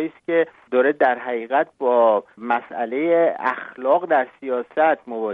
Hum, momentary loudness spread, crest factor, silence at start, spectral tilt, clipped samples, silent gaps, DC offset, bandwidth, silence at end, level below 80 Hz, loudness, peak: none; 8 LU; 16 dB; 0 s; -7.5 dB/octave; under 0.1%; none; under 0.1%; 4.2 kHz; 0 s; -74 dBFS; -20 LUFS; -4 dBFS